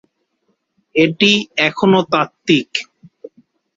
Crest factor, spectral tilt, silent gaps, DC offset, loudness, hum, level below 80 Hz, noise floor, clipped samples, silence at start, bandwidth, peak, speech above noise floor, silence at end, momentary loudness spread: 18 dB; -5 dB/octave; none; under 0.1%; -15 LUFS; none; -60 dBFS; -67 dBFS; under 0.1%; 0.95 s; 7.8 kHz; 0 dBFS; 52 dB; 0.95 s; 9 LU